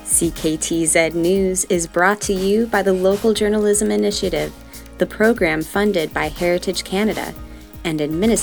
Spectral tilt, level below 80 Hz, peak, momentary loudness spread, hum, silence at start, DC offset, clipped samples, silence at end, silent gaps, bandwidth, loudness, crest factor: -4 dB/octave; -38 dBFS; 0 dBFS; 9 LU; none; 0 s; 0.2%; under 0.1%; 0 s; none; over 20 kHz; -18 LUFS; 18 dB